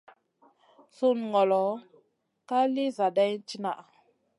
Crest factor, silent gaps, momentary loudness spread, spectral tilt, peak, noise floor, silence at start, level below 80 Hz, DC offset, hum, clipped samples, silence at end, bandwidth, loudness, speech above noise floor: 16 dB; none; 10 LU; -6 dB/octave; -12 dBFS; -70 dBFS; 1 s; -86 dBFS; under 0.1%; none; under 0.1%; 0.55 s; 11.5 kHz; -27 LUFS; 43 dB